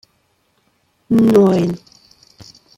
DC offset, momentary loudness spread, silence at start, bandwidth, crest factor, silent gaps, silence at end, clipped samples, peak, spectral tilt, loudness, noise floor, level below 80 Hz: under 0.1%; 12 LU; 1.1 s; 16 kHz; 16 dB; none; 1 s; under 0.1%; -2 dBFS; -8 dB/octave; -14 LUFS; -62 dBFS; -54 dBFS